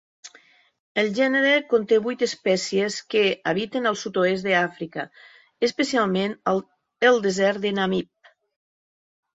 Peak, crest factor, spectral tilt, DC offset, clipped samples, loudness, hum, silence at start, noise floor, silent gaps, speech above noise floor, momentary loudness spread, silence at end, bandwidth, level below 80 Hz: -4 dBFS; 18 dB; -4.5 dB/octave; under 0.1%; under 0.1%; -22 LUFS; none; 0.25 s; -56 dBFS; 0.79-0.95 s; 33 dB; 9 LU; 1.35 s; 8 kHz; -66 dBFS